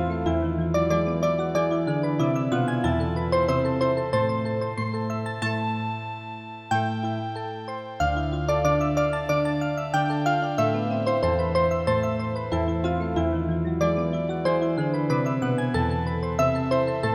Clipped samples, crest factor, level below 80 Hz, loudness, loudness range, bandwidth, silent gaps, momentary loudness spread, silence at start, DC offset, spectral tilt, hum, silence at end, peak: under 0.1%; 14 dB; -40 dBFS; -25 LUFS; 4 LU; 14 kHz; none; 6 LU; 0 s; under 0.1%; -7 dB/octave; none; 0 s; -10 dBFS